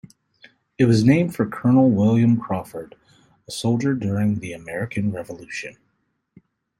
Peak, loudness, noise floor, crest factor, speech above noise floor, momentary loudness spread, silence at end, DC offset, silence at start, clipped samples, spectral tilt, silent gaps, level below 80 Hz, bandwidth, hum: -2 dBFS; -20 LUFS; -71 dBFS; 18 dB; 51 dB; 16 LU; 1.1 s; under 0.1%; 0.8 s; under 0.1%; -7.5 dB/octave; none; -56 dBFS; 14 kHz; none